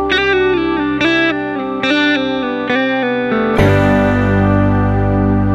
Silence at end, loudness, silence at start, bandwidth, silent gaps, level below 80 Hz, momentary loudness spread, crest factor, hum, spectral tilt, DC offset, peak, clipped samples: 0 s; -14 LUFS; 0 s; 8 kHz; none; -28 dBFS; 4 LU; 14 dB; none; -7 dB/octave; under 0.1%; 0 dBFS; under 0.1%